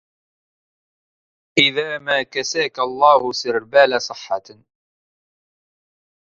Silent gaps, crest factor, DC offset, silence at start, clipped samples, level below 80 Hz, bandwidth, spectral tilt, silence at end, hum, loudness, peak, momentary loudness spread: none; 22 dB; under 0.1%; 1.55 s; under 0.1%; -62 dBFS; 7.6 kHz; -2.5 dB/octave; 2 s; none; -18 LUFS; 0 dBFS; 11 LU